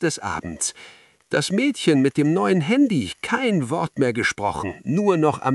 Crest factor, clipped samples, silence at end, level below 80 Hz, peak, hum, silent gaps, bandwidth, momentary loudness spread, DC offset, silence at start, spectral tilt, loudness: 16 dB; under 0.1%; 0 s; -56 dBFS; -6 dBFS; none; none; 12 kHz; 8 LU; under 0.1%; 0 s; -5 dB/octave; -21 LUFS